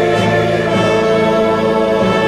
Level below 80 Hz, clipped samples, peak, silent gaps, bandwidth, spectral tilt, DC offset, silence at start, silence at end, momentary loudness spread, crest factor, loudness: -40 dBFS; under 0.1%; -4 dBFS; none; 13.5 kHz; -6 dB/octave; under 0.1%; 0 s; 0 s; 1 LU; 10 dB; -13 LUFS